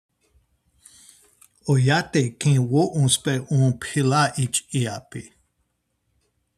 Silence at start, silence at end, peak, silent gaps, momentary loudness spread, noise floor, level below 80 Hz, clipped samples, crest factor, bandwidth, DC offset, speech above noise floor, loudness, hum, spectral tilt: 1.65 s; 1.35 s; -4 dBFS; none; 10 LU; -73 dBFS; -60 dBFS; under 0.1%; 18 dB; 13.5 kHz; under 0.1%; 52 dB; -21 LUFS; none; -5 dB/octave